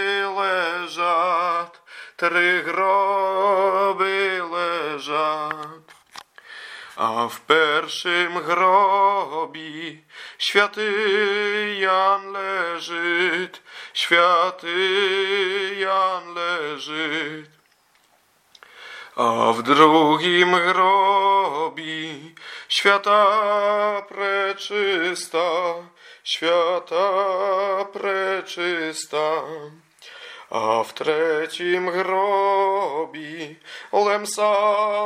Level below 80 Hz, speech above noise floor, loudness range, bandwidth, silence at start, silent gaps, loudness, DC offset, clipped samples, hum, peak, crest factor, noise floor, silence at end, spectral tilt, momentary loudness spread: -78 dBFS; 40 dB; 7 LU; 15.5 kHz; 0 s; none; -20 LUFS; under 0.1%; under 0.1%; none; 0 dBFS; 20 dB; -60 dBFS; 0 s; -3 dB/octave; 16 LU